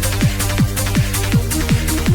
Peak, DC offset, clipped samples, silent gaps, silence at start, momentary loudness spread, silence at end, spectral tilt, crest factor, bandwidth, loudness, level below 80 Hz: -4 dBFS; under 0.1%; under 0.1%; none; 0 s; 1 LU; 0 s; -4.5 dB/octave; 12 dB; over 20 kHz; -17 LUFS; -24 dBFS